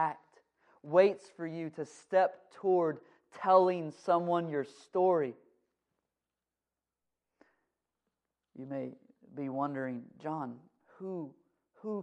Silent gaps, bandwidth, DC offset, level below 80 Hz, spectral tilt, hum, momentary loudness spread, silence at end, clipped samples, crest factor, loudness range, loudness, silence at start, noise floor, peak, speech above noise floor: none; 9.8 kHz; under 0.1%; under -90 dBFS; -7.5 dB/octave; none; 18 LU; 0 s; under 0.1%; 22 dB; 16 LU; -32 LUFS; 0 s; under -90 dBFS; -12 dBFS; over 58 dB